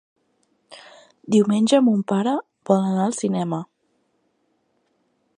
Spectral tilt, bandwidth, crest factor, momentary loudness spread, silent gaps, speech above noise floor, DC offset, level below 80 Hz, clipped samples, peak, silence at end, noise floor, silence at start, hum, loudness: -6 dB/octave; 10.5 kHz; 20 dB; 11 LU; none; 49 dB; under 0.1%; -72 dBFS; under 0.1%; -4 dBFS; 1.75 s; -68 dBFS; 0.7 s; none; -20 LUFS